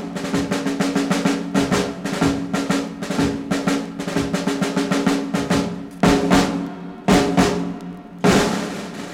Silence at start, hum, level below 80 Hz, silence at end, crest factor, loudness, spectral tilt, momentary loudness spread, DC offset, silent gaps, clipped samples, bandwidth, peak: 0 s; none; -42 dBFS; 0 s; 18 dB; -20 LUFS; -5 dB/octave; 9 LU; under 0.1%; none; under 0.1%; 16.5 kHz; -2 dBFS